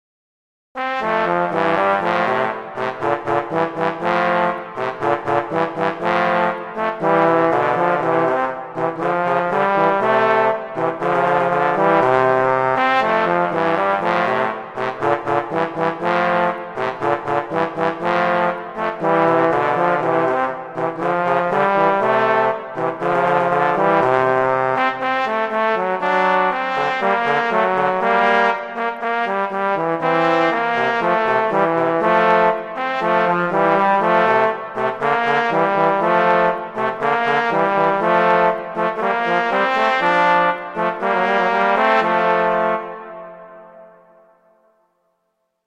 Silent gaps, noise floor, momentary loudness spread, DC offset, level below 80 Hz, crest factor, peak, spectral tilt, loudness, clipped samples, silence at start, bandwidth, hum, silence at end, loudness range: none; -71 dBFS; 7 LU; under 0.1%; -58 dBFS; 16 dB; -2 dBFS; -6.5 dB/octave; -18 LUFS; under 0.1%; 0.75 s; 10.5 kHz; none; 1.8 s; 3 LU